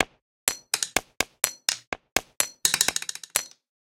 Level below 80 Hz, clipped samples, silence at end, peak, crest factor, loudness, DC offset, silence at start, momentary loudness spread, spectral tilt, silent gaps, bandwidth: -56 dBFS; under 0.1%; 0.35 s; 0 dBFS; 28 dB; -26 LUFS; under 0.1%; 0 s; 8 LU; 0.5 dB/octave; 0.22-0.47 s, 1.87-1.92 s, 2.12-2.16 s; 17 kHz